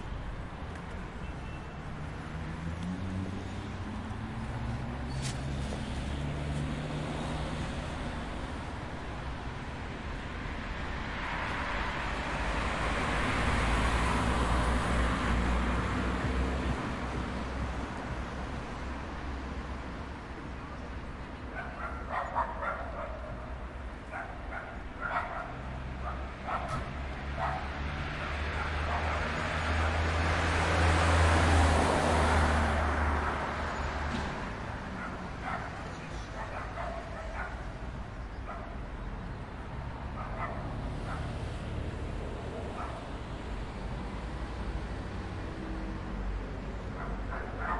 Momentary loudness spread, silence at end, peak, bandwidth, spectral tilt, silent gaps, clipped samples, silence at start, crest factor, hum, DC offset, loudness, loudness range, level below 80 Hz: 12 LU; 0 s; -14 dBFS; 11.5 kHz; -5.5 dB/octave; none; under 0.1%; 0 s; 20 dB; none; under 0.1%; -34 LUFS; 12 LU; -40 dBFS